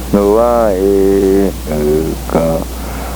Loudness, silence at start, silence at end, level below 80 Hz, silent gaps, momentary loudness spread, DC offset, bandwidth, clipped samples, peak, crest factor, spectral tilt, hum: -13 LUFS; 0 s; 0 s; -24 dBFS; none; 7 LU; under 0.1%; over 20 kHz; under 0.1%; 0 dBFS; 12 dB; -6.5 dB/octave; none